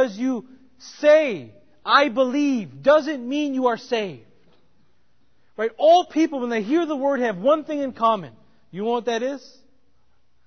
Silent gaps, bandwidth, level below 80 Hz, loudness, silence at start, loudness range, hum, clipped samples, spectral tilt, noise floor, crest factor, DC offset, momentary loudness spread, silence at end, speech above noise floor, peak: none; 6.6 kHz; -68 dBFS; -21 LUFS; 0 s; 4 LU; none; under 0.1%; -5 dB/octave; -67 dBFS; 20 dB; 0.2%; 14 LU; 1.1 s; 47 dB; -2 dBFS